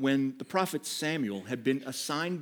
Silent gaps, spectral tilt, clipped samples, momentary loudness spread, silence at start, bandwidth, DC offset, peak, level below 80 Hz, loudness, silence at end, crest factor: none; -4.5 dB/octave; under 0.1%; 3 LU; 0 s; over 20 kHz; under 0.1%; -12 dBFS; -88 dBFS; -32 LUFS; 0 s; 18 dB